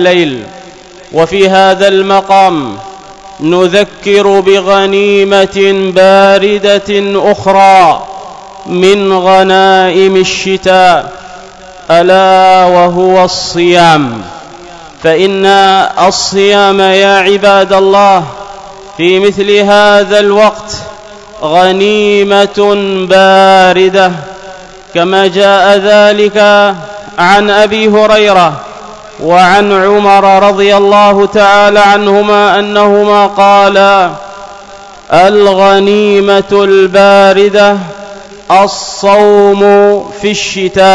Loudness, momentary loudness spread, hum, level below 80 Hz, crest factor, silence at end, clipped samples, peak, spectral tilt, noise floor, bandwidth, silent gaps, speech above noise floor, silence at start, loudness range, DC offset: -6 LUFS; 12 LU; none; -42 dBFS; 6 dB; 0 s; 7%; 0 dBFS; -4.5 dB/octave; -31 dBFS; 11 kHz; none; 26 dB; 0 s; 3 LU; under 0.1%